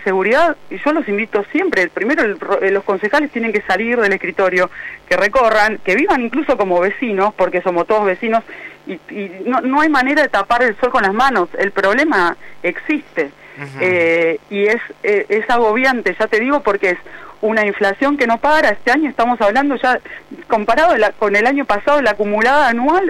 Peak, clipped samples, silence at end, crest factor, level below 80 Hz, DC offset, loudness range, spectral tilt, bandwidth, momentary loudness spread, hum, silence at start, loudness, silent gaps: -4 dBFS; under 0.1%; 0 s; 10 dB; -46 dBFS; under 0.1%; 2 LU; -5 dB/octave; 14.5 kHz; 8 LU; none; 0 s; -15 LUFS; none